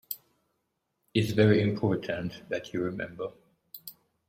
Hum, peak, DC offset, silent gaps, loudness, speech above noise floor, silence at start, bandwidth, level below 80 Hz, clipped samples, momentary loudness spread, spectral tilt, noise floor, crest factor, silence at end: none; -10 dBFS; under 0.1%; none; -29 LUFS; 52 dB; 0.1 s; 16.5 kHz; -62 dBFS; under 0.1%; 22 LU; -7 dB/octave; -79 dBFS; 20 dB; 0.35 s